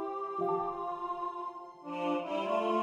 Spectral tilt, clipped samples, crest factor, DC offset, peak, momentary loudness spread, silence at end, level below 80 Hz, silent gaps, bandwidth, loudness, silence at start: -6.5 dB/octave; under 0.1%; 16 dB; under 0.1%; -20 dBFS; 10 LU; 0 s; -70 dBFS; none; 11 kHz; -35 LUFS; 0 s